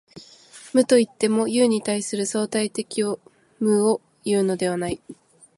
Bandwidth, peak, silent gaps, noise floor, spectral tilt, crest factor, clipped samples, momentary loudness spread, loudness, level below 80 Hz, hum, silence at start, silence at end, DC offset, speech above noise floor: 11.5 kHz; -4 dBFS; none; -47 dBFS; -4.5 dB/octave; 18 dB; under 0.1%; 9 LU; -22 LUFS; -60 dBFS; none; 0.15 s; 0.45 s; under 0.1%; 25 dB